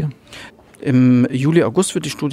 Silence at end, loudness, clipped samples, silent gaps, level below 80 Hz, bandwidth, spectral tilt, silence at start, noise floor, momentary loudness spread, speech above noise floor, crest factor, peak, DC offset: 0 s; -16 LUFS; under 0.1%; none; -56 dBFS; 13.5 kHz; -6 dB/octave; 0 s; -39 dBFS; 23 LU; 24 dB; 16 dB; -2 dBFS; under 0.1%